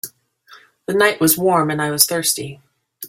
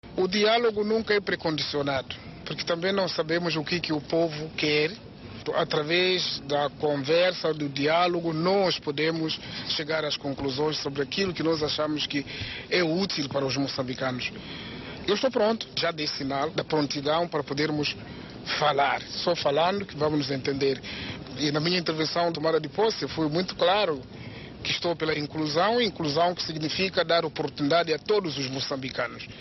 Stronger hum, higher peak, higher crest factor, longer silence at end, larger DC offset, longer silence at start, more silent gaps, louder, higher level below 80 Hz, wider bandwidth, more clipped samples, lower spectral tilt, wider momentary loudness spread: neither; first, 0 dBFS vs -12 dBFS; about the same, 20 dB vs 16 dB; about the same, 0 s vs 0 s; neither; about the same, 0.05 s vs 0.05 s; neither; first, -16 LUFS vs -26 LUFS; about the same, -60 dBFS vs -56 dBFS; first, 16.5 kHz vs 6.2 kHz; neither; about the same, -3 dB/octave vs -3 dB/octave; first, 19 LU vs 9 LU